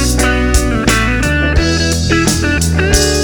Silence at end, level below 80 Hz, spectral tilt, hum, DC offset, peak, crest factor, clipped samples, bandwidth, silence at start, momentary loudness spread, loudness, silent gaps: 0 s; -18 dBFS; -4 dB/octave; none; under 0.1%; 0 dBFS; 12 dB; under 0.1%; over 20 kHz; 0 s; 2 LU; -12 LUFS; none